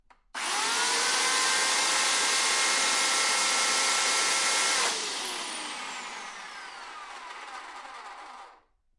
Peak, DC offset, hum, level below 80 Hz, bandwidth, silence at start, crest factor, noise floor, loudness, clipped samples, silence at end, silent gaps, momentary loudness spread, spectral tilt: -12 dBFS; under 0.1%; none; -70 dBFS; 11.5 kHz; 0.35 s; 16 dB; -59 dBFS; -24 LUFS; under 0.1%; 0.45 s; none; 18 LU; 2 dB/octave